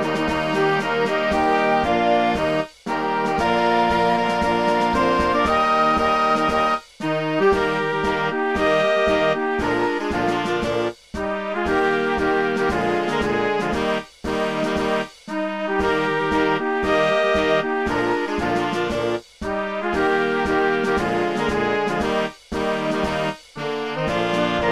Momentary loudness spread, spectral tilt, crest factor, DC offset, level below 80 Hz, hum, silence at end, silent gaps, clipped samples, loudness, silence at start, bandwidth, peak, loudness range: 7 LU; -5.5 dB/octave; 14 dB; 0.4%; -42 dBFS; none; 0 s; none; under 0.1%; -21 LUFS; 0 s; 14 kHz; -6 dBFS; 3 LU